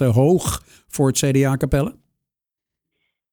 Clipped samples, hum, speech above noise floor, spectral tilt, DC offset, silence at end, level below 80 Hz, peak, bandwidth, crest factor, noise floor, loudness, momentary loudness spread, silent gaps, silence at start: under 0.1%; none; 69 dB; -6 dB/octave; under 0.1%; 1.4 s; -38 dBFS; -4 dBFS; over 20 kHz; 16 dB; -86 dBFS; -19 LUFS; 12 LU; none; 0 s